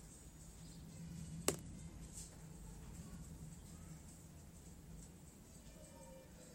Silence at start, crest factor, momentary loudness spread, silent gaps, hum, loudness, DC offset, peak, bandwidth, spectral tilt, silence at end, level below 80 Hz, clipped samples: 0 s; 38 dB; 16 LU; none; none; -52 LUFS; under 0.1%; -16 dBFS; 16 kHz; -4 dB/octave; 0 s; -60 dBFS; under 0.1%